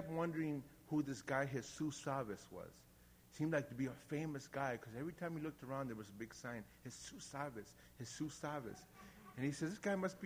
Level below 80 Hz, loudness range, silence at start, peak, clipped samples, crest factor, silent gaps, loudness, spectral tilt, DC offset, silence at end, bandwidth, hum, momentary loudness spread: -72 dBFS; 5 LU; 0 s; -24 dBFS; under 0.1%; 20 dB; none; -45 LUFS; -5.5 dB/octave; under 0.1%; 0 s; over 20 kHz; 60 Hz at -70 dBFS; 14 LU